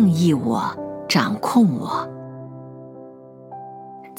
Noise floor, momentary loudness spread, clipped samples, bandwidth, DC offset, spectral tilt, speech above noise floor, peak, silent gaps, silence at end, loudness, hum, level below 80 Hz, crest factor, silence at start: -41 dBFS; 22 LU; under 0.1%; 17 kHz; under 0.1%; -6 dB/octave; 22 dB; -4 dBFS; none; 0 s; -20 LUFS; none; -66 dBFS; 18 dB; 0 s